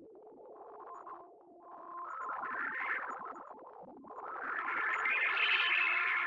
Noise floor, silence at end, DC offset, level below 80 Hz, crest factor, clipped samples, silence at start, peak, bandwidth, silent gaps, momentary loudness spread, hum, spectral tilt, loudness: -56 dBFS; 0 s; under 0.1%; -84 dBFS; 18 dB; under 0.1%; 0 s; -18 dBFS; 8.2 kHz; none; 24 LU; none; -1.5 dB/octave; -33 LUFS